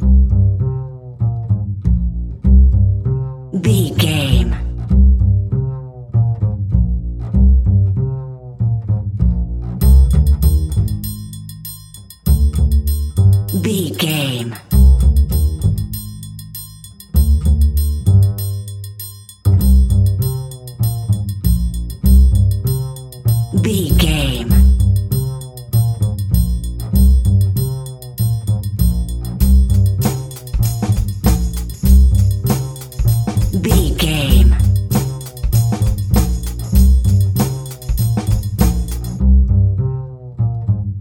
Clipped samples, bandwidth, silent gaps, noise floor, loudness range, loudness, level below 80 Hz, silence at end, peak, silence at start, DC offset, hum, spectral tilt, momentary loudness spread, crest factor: under 0.1%; 16.5 kHz; none; -37 dBFS; 2 LU; -16 LUFS; -16 dBFS; 0 s; 0 dBFS; 0 s; under 0.1%; none; -6.5 dB/octave; 13 LU; 14 dB